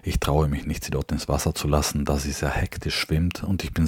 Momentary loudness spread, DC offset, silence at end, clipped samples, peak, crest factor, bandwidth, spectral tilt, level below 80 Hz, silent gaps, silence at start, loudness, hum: 5 LU; under 0.1%; 0 s; under 0.1%; -4 dBFS; 20 dB; 17.5 kHz; -5 dB/octave; -32 dBFS; none; 0.05 s; -25 LUFS; none